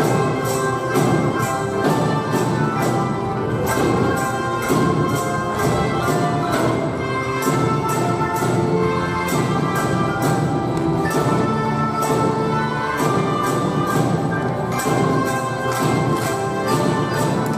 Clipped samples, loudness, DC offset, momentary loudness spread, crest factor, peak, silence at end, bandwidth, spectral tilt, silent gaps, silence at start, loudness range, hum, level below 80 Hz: under 0.1%; -19 LUFS; under 0.1%; 3 LU; 16 dB; -4 dBFS; 0 s; 16 kHz; -6 dB/octave; none; 0 s; 0 LU; none; -44 dBFS